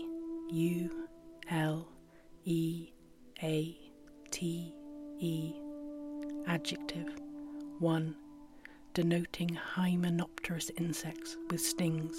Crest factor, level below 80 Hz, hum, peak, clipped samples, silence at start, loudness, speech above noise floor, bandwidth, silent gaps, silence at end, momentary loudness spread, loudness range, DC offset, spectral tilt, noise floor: 18 dB; -64 dBFS; none; -20 dBFS; under 0.1%; 0 s; -37 LUFS; 22 dB; 16.5 kHz; none; 0 s; 17 LU; 5 LU; under 0.1%; -5.5 dB/octave; -57 dBFS